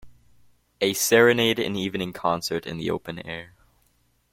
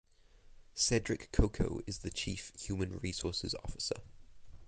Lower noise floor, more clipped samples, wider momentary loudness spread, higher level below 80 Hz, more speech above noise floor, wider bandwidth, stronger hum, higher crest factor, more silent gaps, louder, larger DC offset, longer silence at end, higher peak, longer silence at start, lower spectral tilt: first, -66 dBFS vs -60 dBFS; neither; first, 17 LU vs 9 LU; second, -58 dBFS vs -44 dBFS; first, 43 dB vs 24 dB; first, 16.5 kHz vs 9.6 kHz; neither; second, 20 dB vs 26 dB; neither; first, -23 LUFS vs -37 LUFS; neither; first, 0.85 s vs 0 s; first, -4 dBFS vs -12 dBFS; second, 0.05 s vs 0.45 s; about the same, -3.5 dB/octave vs -4 dB/octave